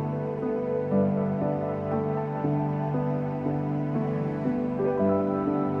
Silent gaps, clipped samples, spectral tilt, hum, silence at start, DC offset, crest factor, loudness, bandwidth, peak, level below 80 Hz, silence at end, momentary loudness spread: none; under 0.1%; -11 dB/octave; none; 0 s; under 0.1%; 14 dB; -27 LUFS; 5 kHz; -12 dBFS; -58 dBFS; 0 s; 4 LU